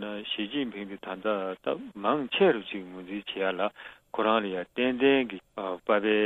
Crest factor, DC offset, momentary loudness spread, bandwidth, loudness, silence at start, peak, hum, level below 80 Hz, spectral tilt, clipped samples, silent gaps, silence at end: 18 dB; under 0.1%; 14 LU; 4.1 kHz; -29 LUFS; 0 s; -10 dBFS; none; -68 dBFS; -7 dB/octave; under 0.1%; none; 0 s